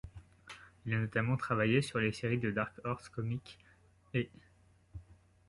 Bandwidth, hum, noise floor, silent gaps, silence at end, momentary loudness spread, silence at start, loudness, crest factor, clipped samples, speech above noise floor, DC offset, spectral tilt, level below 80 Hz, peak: 11.5 kHz; none; -65 dBFS; none; 0.35 s; 23 LU; 0.05 s; -35 LUFS; 20 dB; under 0.1%; 31 dB; under 0.1%; -6.5 dB/octave; -60 dBFS; -16 dBFS